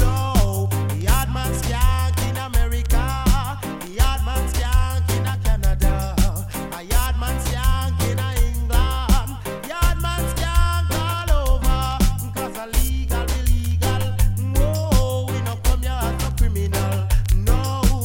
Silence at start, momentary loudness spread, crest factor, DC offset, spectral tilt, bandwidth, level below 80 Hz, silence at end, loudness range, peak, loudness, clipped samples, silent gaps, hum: 0 s; 3 LU; 16 dB; under 0.1%; -5 dB/octave; 17 kHz; -20 dBFS; 0 s; 1 LU; -4 dBFS; -22 LUFS; under 0.1%; none; none